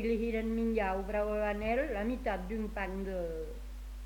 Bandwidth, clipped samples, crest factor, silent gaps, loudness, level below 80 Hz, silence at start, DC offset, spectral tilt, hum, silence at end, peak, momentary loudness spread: 19 kHz; under 0.1%; 14 dB; none; -35 LUFS; -44 dBFS; 0 s; under 0.1%; -7 dB/octave; none; 0 s; -20 dBFS; 9 LU